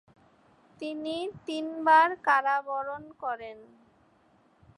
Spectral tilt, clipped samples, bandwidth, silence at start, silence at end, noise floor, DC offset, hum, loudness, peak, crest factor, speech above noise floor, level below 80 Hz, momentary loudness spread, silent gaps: -4 dB/octave; under 0.1%; 11 kHz; 0.8 s; 1.15 s; -64 dBFS; under 0.1%; none; -27 LUFS; -10 dBFS; 20 dB; 36 dB; -74 dBFS; 17 LU; none